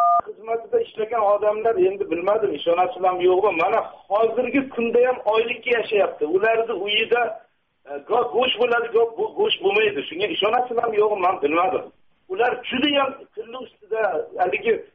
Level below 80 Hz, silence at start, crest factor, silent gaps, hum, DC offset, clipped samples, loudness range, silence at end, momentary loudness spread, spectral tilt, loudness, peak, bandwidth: -64 dBFS; 0 s; 12 dB; none; none; under 0.1%; under 0.1%; 2 LU; 0.1 s; 7 LU; -1 dB/octave; -21 LUFS; -8 dBFS; 5 kHz